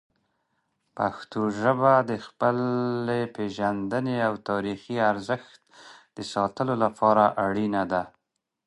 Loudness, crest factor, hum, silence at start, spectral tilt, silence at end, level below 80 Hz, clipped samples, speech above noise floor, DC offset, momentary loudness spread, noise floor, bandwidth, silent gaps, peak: -26 LUFS; 20 dB; none; 0.95 s; -7 dB/octave; 0.6 s; -64 dBFS; under 0.1%; 56 dB; under 0.1%; 11 LU; -81 dBFS; 11.5 kHz; none; -6 dBFS